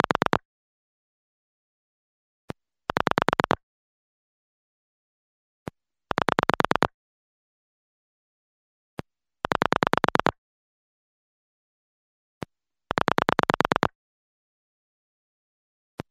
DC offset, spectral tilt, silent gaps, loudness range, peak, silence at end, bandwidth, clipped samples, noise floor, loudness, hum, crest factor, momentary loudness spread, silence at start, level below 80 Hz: under 0.1%; -5 dB/octave; 0.45-2.48 s, 3.63-5.66 s, 6.94-8.97 s, 10.38-12.41 s; 3 LU; -2 dBFS; 2.25 s; 16 kHz; under 0.1%; -43 dBFS; -25 LUFS; none; 28 dB; 20 LU; 0.35 s; -54 dBFS